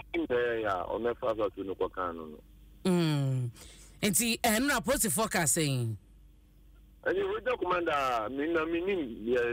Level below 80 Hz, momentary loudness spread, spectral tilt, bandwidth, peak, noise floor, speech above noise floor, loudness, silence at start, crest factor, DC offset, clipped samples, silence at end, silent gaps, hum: -54 dBFS; 10 LU; -4 dB/octave; 16 kHz; -16 dBFS; -57 dBFS; 27 dB; -30 LUFS; 0 s; 16 dB; under 0.1%; under 0.1%; 0 s; none; none